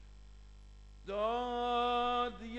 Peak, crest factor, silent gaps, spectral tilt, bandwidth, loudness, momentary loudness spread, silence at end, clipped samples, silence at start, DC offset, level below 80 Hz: -22 dBFS; 16 dB; none; -5 dB/octave; 8.8 kHz; -35 LUFS; 8 LU; 0 s; under 0.1%; 0 s; under 0.1%; -54 dBFS